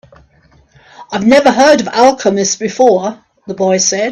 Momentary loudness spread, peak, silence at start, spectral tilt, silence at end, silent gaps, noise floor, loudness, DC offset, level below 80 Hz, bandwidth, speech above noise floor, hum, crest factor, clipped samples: 10 LU; 0 dBFS; 1 s; -3.5 dB/octave; 0 s; none; -49 dBFS; -11 LUFS; under 0.1%; -50 dBFS; 11 kHz; 38 dB; none; 12 dB; under 0.1%